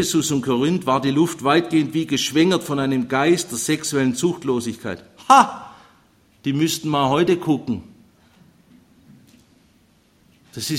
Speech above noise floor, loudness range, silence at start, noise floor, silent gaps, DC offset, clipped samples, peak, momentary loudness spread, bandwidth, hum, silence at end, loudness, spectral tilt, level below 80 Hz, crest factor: 38 dB; 6 LU; 0 s; -57 dBFS; none; under 0.1%; under 0.1%; 0 dBFS; 13 LU; 16 kHz; none; 0 s; -19 LUFS; -4.5 dB/octave; -58 dBFS; 20 dB